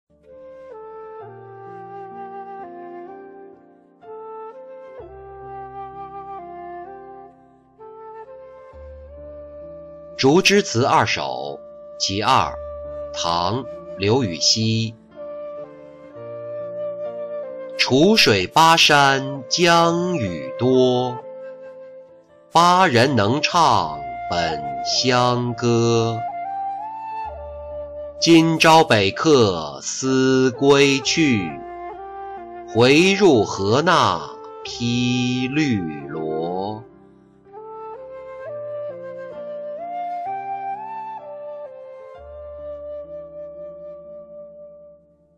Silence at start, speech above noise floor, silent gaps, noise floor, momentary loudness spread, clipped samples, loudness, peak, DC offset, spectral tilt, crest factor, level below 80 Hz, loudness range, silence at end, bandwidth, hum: 0.3 s; 34 dB; none; -51 dBFS; 24 LU; under 0.1%; -18 LUFS; -4 dBFS; under 0.1%; -4.5 dB/octave; 18 dB; -52 dBFS; 21 LU; 0.5 s; 15.5 kHz; none